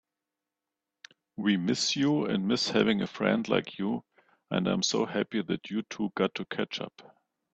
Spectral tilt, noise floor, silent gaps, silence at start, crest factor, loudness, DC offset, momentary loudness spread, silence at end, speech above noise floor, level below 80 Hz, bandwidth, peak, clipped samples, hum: -4.5 dB/octave; -88 dBFS; none; 1.4 s; 22 dB; -29 LUFS; under 0.1%; 8 LU; 0.55 s; 59 dB; -68 dBFS; 8.6 kHz; -8 dBFS; under 0.1%; none